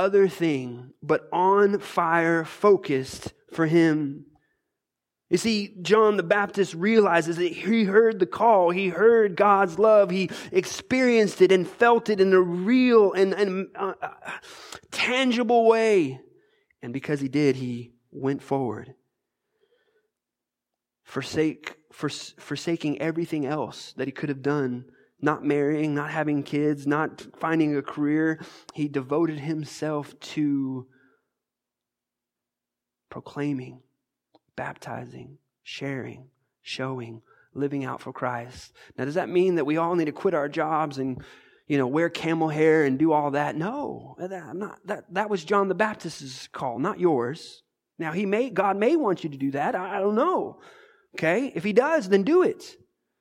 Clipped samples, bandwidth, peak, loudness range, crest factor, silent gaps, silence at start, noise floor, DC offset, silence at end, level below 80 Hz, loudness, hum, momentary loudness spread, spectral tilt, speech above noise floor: under 0.1%; 14 kHz; -6 dBFS; 14 LU; 18 dB; none; 0 s; -88 dBFS; under 0.1%; 0.5 s; -68 dBFS; -24 LUFS; none; 17 LU; -6 dB/octave; 64 dB